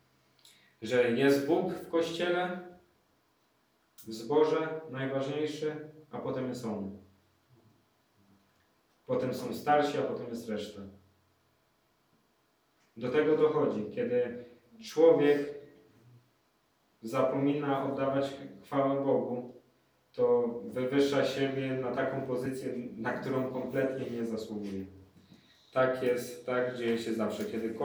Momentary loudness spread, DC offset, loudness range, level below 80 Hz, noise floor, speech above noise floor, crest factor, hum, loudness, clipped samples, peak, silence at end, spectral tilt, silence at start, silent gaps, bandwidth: 15 LU; under 0.1%; 8 LU; -76 dBFS; -72 dBFS; 41 dB; 20 dB; none; -31 LUFS; under 0.1%; -12 dBFS; 0 s; -6 dB/octave; 0.8 s; none; over 20 kHz